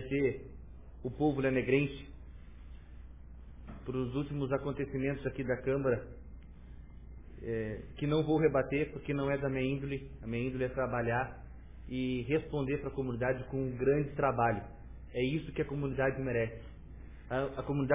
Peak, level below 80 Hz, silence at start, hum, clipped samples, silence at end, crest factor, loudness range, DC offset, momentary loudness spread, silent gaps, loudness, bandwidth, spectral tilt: -16 dBFS; -50 dBFS; 0 s; none; under 0.1%; 0 s; 20 dB; 4 LU; 0.1%; 23 LU; none; -34 LUFS; 3.8 kHz; -6.5 dB/octave